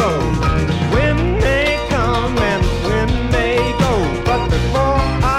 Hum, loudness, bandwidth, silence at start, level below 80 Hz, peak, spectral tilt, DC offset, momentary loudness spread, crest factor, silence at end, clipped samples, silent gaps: none; -16 LUFS; 14.5 kHz; 0 s; -22 dBFS; -2 dBFS; -6 dB/octave; under 0.1%; 2 LU; 14 dB; 0 s; under 0.1%; none